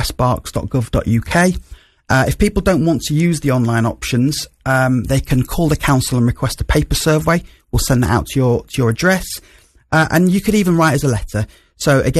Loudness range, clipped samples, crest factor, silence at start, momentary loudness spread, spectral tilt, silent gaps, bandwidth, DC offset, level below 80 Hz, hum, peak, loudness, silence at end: 1 LU; under 0.1%; 14 dB; 0 s; 7 LU; -5.5 dB/octave; none; 14 kHz; under 0.1%; -28 dBFS; none; -2 dBFS; -16 LUFS; 0 s